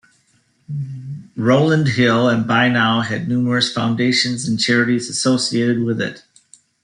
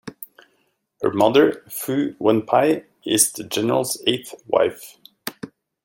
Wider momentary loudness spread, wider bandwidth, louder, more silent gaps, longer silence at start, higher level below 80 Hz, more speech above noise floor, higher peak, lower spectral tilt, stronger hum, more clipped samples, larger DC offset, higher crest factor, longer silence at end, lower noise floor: second, 13 LU vs 22 LU; second, 11 kHz vs 17 kHz; first, -17 LUFS vs -20 LUFS; neither; first, 0.7 s vs 0.05 s; first, -60 dBFS vs -66 dBFS; second, 43 dB vs 48 dB; about the same, -2 dBFS vs 0 dBFS; first, -5 dB/octave vs -3.5 dB/octave; neither; neither; neither; second, 16 dB vs 22 dB; first, 0.65 s vs 0.4 s; second, -60 dBFS vs -67 dBFS